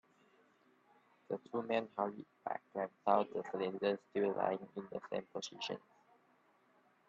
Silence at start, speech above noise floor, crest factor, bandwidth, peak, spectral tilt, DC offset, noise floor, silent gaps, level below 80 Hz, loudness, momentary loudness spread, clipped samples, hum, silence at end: 1.3 s; 33 dB; 24 dB; 7.8 kHz; -16 dBFS; -5 dB/octave; under 0.1%; -72 dBFS; none; -84 dBFS; -40 LUFS; 12 LU; under 0.1%; none; 1.3 s